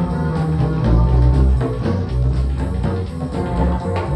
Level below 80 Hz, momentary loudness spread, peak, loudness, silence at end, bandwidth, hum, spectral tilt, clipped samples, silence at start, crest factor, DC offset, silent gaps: -20 dBFS; 7 LU; -4 dBFS; -19 LUFS; 0 s; 9 kHz; none; -9 dB/octave; under 0.1%; 0 s; 14 dB; under 0.1%; none